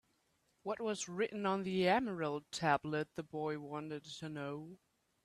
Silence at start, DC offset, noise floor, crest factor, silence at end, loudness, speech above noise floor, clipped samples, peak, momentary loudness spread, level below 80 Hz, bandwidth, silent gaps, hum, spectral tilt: 0.65 s; under 0.1%; -78 dBFS; 22 dB; 0.5 s; -38 LUFS; 40 dB; under 0.1%; -18 dBFS; 13 LU; -74 dBFS; 13 kHz; none; none; -5 dB/octave